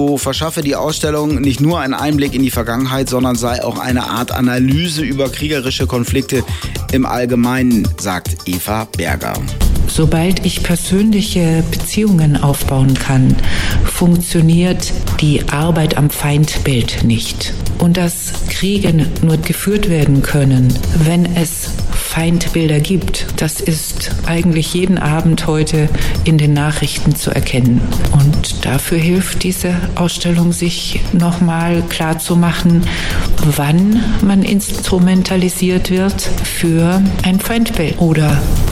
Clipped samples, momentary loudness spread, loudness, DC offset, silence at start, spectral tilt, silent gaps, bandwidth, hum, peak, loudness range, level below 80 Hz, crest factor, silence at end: under 0.1%; 6 LU; -14 LUFS; under 0.1%; 0 s; -5.5 dB/octave; none; 16.5 kHz; none; 0 dBFS; 3 LU; -22 dBFS; 12 dB; 0 s